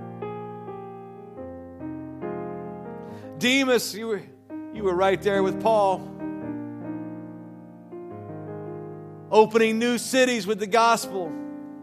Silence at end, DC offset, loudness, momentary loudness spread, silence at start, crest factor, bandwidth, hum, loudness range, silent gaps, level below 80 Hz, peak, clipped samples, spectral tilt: 0 s; under 0.1%; -24 LUFS; 20 LU; 0 s; 22 dB; 15 kHz; none; 13 LU; none; -64 dBFS; -4 dBFS; under 0.1%; -4 dB/octave